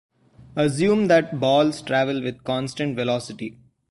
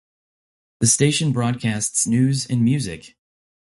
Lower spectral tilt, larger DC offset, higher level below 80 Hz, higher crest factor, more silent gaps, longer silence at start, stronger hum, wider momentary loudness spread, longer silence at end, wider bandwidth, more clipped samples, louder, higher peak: about the same, -5.5 dB/octave vs -4.5 dB/octave; neither; second, -60 dBFS vs -52 dBFS; about the same, 18 dB vs 18 dB; neither; second, 0.4 s vs 0.8 s; neither; first, 13 LU vs 7 LU; second, 0.4 s vs 0.75 s; about the same, 11.5 kHz vs 12 kHz; neither; second, -22 LUFS vs -19 LUFS; about the same, -6 dBFS vs -4 dBFS